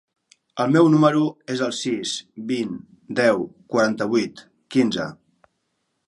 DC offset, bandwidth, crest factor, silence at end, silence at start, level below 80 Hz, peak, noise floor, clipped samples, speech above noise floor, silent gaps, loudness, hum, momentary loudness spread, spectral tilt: under 0.1%; 11.5 kHz; 20 dB; 0.95 s; 0.55 s; -66 dBFS; -2 dBFS; -74 dBFS; under 0.1%; 53 dB; none; -21 LUFS; none; 14 LU; -5.5 dB/octave